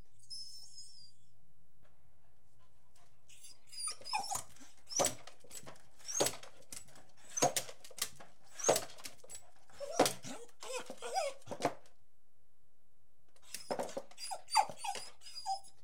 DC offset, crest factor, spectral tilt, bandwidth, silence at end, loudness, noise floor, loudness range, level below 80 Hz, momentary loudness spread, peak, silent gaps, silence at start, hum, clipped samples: 0.5%; 28 dB; -1.5 dB/octave; 16 kHz; 0.15 s; -38 LUFS; -79 dBFS; 9 LU; -74 dBFS; 20 LU; -14 dBFS; none; 0 s; none; under 0.1%